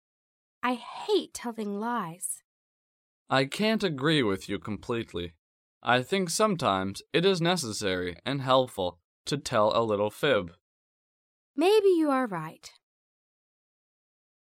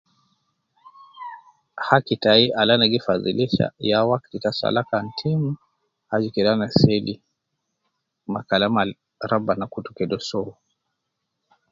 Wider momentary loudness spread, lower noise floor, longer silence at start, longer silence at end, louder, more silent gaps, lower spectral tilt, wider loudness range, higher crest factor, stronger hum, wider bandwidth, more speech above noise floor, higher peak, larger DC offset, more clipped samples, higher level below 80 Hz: second, 11 LU vs 18 LU; first, under -90 dBFS vs -78 dBFS; second, 0.65 s vs 1.15 s; first, 1.8 s vs 1.2 s; second, -28 LUFS vs -21 LUFS; first, 2.44-3.26 s, 5.38-5.81 s, 9.04-9.25 s, 10.61-11.54 s vs none; second, -4.5 dB/octave vs -6.5 dB/octave; second, 3 LU vs 6 LU; about the same, 20 dB vs 22 dB; neither; first, 16.5 kHz vs 7.6 kHz; first, over 63 dB vs 58 dB; second, -8 dBFS vs 0 dBFS; neither; neither; second, -64 dBFS vs -56 dBFS